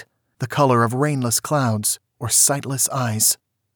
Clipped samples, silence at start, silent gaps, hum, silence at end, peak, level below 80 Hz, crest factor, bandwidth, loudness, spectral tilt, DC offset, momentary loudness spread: under 0.1%; 0 s; none; none; 0.4 s; -4 dBFS; -64 dBFS; 16 dB; over 20 kHz; -19 LUFS; -3.5 dB/octave; under 0.1%; 10 LU